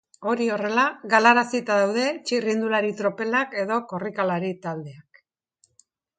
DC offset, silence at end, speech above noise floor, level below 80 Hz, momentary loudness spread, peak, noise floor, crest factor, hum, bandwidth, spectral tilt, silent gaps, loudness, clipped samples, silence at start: under 0.1%; 1.15 s; 44 dB; -74 dBFS; 12 LU; -4 dBFS; -67 dBFS; 22 dB; none; 9.4 kHz; -4.5 dB/octave; none; -23 LUFS; under 0.1%; 0.2 s